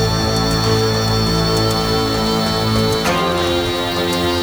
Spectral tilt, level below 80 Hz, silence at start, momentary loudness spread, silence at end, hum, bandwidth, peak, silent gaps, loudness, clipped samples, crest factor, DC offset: -4.5 dB/octave; -30 dBFS; 0 s; 2 LU; 0 s; none; over 20 kHz; -4 dBFS; none; -16 LUFS; under 0.1%; 12 dB; under 0.1%